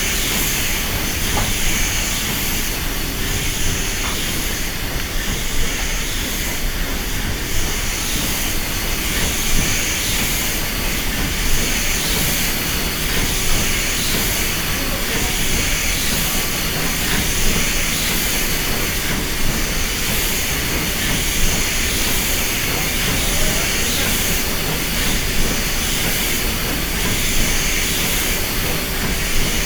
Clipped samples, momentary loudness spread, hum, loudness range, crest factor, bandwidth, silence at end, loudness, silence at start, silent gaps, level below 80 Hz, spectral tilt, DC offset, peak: under 0.1%; 4 LU; none; 3 LU; 16 dB; over 20 kHz; 0 s; -18 LUFS; 0 s; none; -24 dBFS; -2 dB/octave; under 0.1%; -4 dBFS